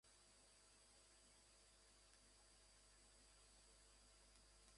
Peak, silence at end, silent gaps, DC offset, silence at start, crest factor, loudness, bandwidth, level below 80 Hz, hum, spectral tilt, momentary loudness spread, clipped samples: -46 dBFS; 0 s; none; under 0.1%; 0.05 s; 24 dB; -70 LUFS; 11.5 kHz; -78 dBFS; 50 Hz at -80 dBFS; -1.5 dB/octave; 1 LU; under 0.1%